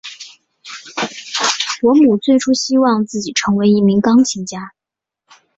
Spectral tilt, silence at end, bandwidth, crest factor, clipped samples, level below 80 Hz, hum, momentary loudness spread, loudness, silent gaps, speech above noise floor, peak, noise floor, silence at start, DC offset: -4.5 dB/octave; 0.9 s; 8 kHz; 14 dB; under 0.1%; -56 dBFS; none; 19 LU; -14 LUFS; none; 72 dB; -2 dBFS; -85 dBFS; 0.05 s; under 0.1%